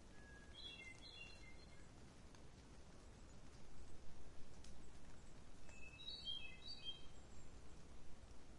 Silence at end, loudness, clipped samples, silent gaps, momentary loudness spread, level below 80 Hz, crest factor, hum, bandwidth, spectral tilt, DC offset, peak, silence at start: 0 s; -58 LUFS; under 0.1%; none; 13 LU; -64 dBFS; 14 dB; none; 11 kHz; -3 dB/octave; under 0.1%; -38 dBFS; 0 s